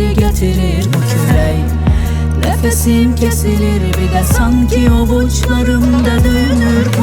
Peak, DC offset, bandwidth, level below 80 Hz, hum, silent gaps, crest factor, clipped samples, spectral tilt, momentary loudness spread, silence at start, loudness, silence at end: 0 dBFS; under 0.1%; 18.5 kHz; -16 dBFS; none; none; 10 dB; under 0.1%; -6 dB/octave; 3 LU; 0 s; -12 LUFS; 0 s